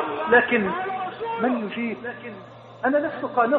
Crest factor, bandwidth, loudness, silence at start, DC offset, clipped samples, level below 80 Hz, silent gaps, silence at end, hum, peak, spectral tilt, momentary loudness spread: 20 dB; 4.7 kHz; -23 LUFS; 0 s; under 0.1%; under 0.1%; -62 dBFS; none; 0 s; none; -4 dBFS; -3 dB/octave; 19 LU